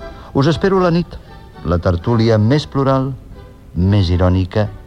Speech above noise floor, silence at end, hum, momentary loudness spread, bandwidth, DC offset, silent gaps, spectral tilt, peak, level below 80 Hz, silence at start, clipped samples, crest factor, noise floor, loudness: 22 dB; 0.05 s; none; 14 LU; 8.6 kHz; 0.2%; none; -8 dB/octave; -2 dBFS; -32 dBFS; 0 s; under 0.1%; 14 dB; -36 dBFS; -16 LUFS